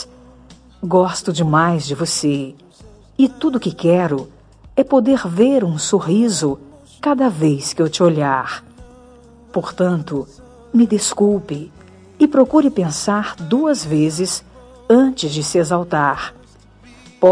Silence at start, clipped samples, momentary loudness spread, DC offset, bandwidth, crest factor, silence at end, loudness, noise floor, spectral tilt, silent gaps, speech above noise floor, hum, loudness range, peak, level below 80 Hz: 0 s; under 0.1%; 12 LU; under 0.1%; 10.5 kHz; 18 dB; 0 s; -17 LUFS; -45 dBFS; -5.5 dB/octave; none; 29 dB; none; 3 LU; 0 dBFS; -50 dBFS